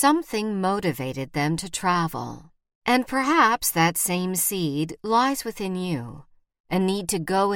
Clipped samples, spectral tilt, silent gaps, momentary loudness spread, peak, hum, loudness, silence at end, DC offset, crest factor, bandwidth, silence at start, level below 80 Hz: under 0.1%; -4 dB/octave; 2.75-2.81 s, 6.60-6.64 s; 10 LU; -6 dBFS; none; -24 LUFS; 0 s; under 0.1%; 18 dB; 17.5 kHz; 0 s; -54 dBFS